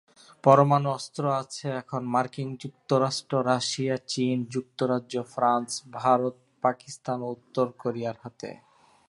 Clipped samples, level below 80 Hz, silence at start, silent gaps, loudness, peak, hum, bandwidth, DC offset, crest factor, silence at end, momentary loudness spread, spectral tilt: under 0.1%; -74 dBFS; 0.45 s; none; -27 LUFS; -4 dBFS; none; 11.5 kHz; under 0.1%; 22 dB; 0.55 s; 12 LU; -5.5 dB/octave